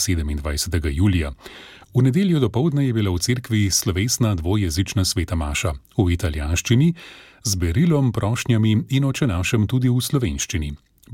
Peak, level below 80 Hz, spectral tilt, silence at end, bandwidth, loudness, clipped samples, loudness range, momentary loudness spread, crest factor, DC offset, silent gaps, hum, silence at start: -6 dBFS; -34 dBFS; -5 dB/octave; 0 s; 17 kHz; -21 LUFS; under 0.1%; 1 LU; 7 LU; 14 dB; under 0.1%; none; none; 0 s